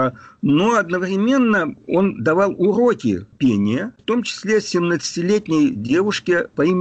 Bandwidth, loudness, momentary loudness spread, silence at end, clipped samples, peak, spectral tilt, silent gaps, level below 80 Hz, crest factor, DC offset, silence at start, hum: 8.6 kHz; -18 LUFS; 5 LU; 0 s; under 0.1%; -8 dBFS; -6 dB/octave; none; -56 dBFS; 10 dB; under 0.1%; 0 s; none